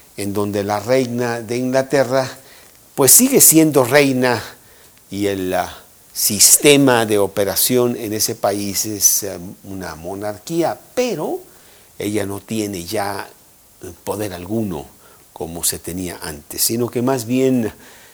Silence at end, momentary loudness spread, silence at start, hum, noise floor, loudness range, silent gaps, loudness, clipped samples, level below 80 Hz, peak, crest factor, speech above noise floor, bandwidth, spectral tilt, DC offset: 0.25 s; 20 LU; 0.15 s; none; -47 dBFS; 12 LU; none; -16 LUFS; under 0.1%; -52 dBFS; 0 dBFS; 18 dB; 29 dB; over 20 kHz; -3 dB/octave; under 0.1%